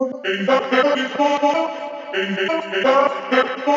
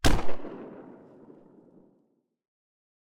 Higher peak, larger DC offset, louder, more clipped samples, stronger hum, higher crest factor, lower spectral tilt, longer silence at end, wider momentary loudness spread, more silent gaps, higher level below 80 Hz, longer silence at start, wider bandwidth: first, -4 dBFS vs -8 dBFS; neither; first, -19 LUFS vs -35 LUFS; neither; neither; about the same, 16 dB vs 20 dB; about the same, -4.5 dB/octave vs -4.5 dB/octave; second, 0 s vs 0.55 s; second, 7 LU vs 25 LU; neither; second, -86 dBFS vs -36 dBFS; about the same, 0 s vs 0 s; second, 7.6 kHz vs 16.5 kHz